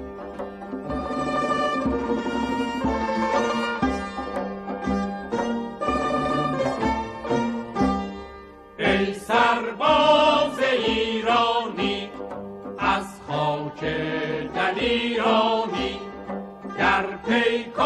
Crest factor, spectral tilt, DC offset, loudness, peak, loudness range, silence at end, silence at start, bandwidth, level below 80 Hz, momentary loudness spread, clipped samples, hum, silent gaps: 18 dB; -5 dB/octave; under 0.1%; -23 LUFS; -6 dBFS; 5 LU; 0 s; 0 s; 12.5 kHz; -46 dBFS; 14 LU; under 0.1%; none; none